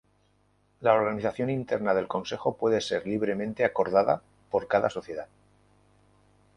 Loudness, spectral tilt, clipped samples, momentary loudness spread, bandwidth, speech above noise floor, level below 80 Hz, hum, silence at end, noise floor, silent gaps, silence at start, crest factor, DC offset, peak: -27 LUFS; -6 dB/octave; under 0.1%; 8 LU; 11 kHz; 40 dB; -62 dBFS; 50 Hz at -55 dBFS; 1.3 s; -67 dBFS; none; 0.8 s; 22 dB; under 0.1%; -8 dBFS